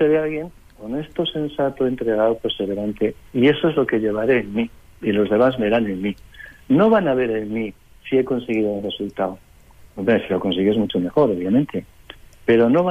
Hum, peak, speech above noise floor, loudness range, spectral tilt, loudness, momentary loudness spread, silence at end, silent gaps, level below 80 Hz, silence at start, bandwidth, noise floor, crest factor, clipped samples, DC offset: none; -6 dBFS; 28 dB; 3 LU; -8 dB/octave; -20 LUFS; 12 LU; 0 s; none; -50 dBFS; 0 s; 14 kHz; -47 dBFS; 14 dB; under 0.1%; under 0.1%